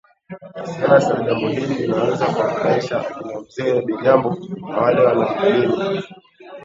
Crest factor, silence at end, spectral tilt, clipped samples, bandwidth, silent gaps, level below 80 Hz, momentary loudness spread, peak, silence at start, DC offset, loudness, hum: 18 dB; 0 s; -7 dB/octave; under 0.1%; 7.8 kHz; none; -58 dBFS; 15 LU; 0 dBFS; 0.3 s; under 0.1%; -18 LUFS; none